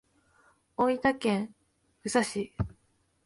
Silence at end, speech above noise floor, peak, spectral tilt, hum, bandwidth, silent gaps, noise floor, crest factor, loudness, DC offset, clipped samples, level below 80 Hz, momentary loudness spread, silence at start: 0.6 s; 42 dB; -12 dBFS; -5 dB/octave; none; 11.5 kHz; none; -71 dBFS; 20 dB; -30 LUFS; under 0.1%; under 0.1%; -52 dBFS; 14 LU; 0.8 s